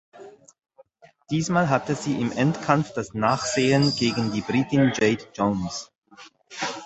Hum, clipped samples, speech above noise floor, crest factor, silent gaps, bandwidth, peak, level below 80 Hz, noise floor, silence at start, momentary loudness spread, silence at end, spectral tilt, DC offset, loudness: none; under 0.1%; 31 dB; 22 dB; 5.98-6.02 s; 8.4 kHz; -2 dBFS; -56 dBFS; -54 dBFS; 0.15 s; 10 LU; 0 s; -5.5 dB/octave; under 0.1%; -23 LUFS